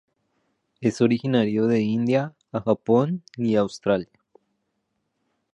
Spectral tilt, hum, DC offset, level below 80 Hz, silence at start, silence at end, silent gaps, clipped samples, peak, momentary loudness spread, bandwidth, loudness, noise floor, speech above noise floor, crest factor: -7.5 dB/octave; none; under 0.1%; -62 dBFS; 0.8 s; 1.5 s; none; under 0.1%; -6 dBFS; 7 LU; 9 kHz; -23 LUFS; -75 dBFS; 54 dB; 18 dB